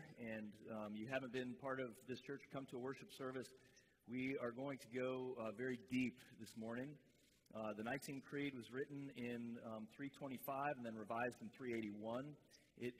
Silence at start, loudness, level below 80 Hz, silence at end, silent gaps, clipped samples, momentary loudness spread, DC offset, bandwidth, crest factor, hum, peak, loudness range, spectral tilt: 0 s; -49 LUFS; -84 dBFS; 0 s; none; under 0.1%; 8 LU; under 0.1%; 15.5 kHz; 18 dB; none; -30 dBFS; 3 LU; -6 dB/octave